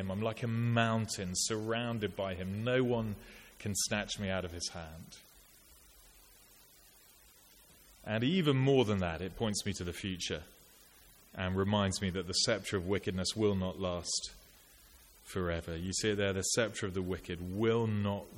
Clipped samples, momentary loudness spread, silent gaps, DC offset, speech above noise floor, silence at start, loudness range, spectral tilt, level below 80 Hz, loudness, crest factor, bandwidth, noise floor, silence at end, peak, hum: under 0.1%; 10 LU; none; under 0.1%; 27 dB; 0 s; 6 LU; -4.5 dB/octave; -58 dBFS; -34 LUFS; 22 dB; 17 kHz; -61 dBFS; 0 s; -14 dBFS; none